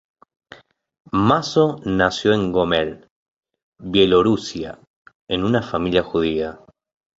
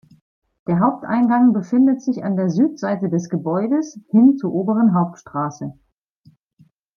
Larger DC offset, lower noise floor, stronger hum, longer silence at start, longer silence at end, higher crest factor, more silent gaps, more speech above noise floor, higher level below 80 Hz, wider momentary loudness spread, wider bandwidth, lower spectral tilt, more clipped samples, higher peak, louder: neither; second, -47 dBFS vs -56 dBFS; neither; first, 1.15 s vs 0.7 s; second, 0.65 s vs 1.25 s; about the same, 20 dB vs 16 dB; first, 3.11-3.43 s, 3.63-3.72 s, 4.87-5.05 s, 5.15-5.27 s vs none; second, 29 dB vs 39 dB; first, -46 dBFS vs -64 dBFS; about the same, 13 LU vs 11 LU; first, 8 kHz vs 6.8 kHz; second, -6 dB/octave vs -8.5 dB/octave; neither; about the same, -2 dBFS vs -4 dBFS; about the same, -19 LUFS vs -18 LUFS